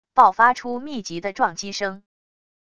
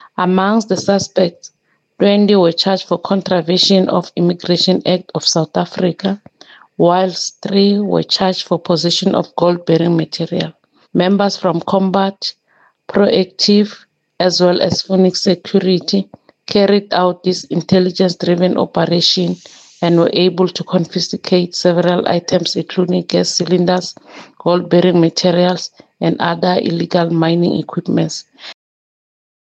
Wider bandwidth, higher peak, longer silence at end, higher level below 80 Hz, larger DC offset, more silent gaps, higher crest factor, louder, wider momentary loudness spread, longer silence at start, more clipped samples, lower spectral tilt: first, 10.5 kHz vs 8.4 kHz; about the same, -2 dBFS vs 0 dBFS; second, 0.75 s vs 1 s; about the same, -60 dBFS vs -58 dBFS; first, 0.5% vs under 0.1%; neither; first, 20 dB vs 14 dB; second, -21 LUFS vs -14 LUFS; first, 15 LU vs 8 LU; about the same, 0.15 s vs 0.2 s; neither; second, -3 dB/octave vs -5.5 dB/octave